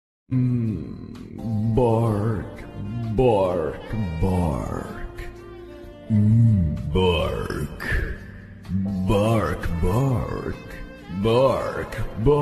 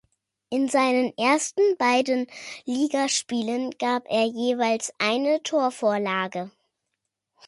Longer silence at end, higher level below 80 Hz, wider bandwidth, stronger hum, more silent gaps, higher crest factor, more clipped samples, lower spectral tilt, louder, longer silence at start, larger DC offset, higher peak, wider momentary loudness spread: second, 0 s vs 1 s; first, -34 dBFS vs -74 dBFS; first, 13 kHz vs 11.5 kHz; neither; neither; about the same, 16 dB vs 16 dB; neither; first, -8 dB/octave vs -3 dB/octave; about the same, -23 LUFS vs -24 LUFS; second, 0.3 s vs 0.5 s; neither; about the same, -6 dBFS vs -8 dBFS; first, 18 LU vs 9 LU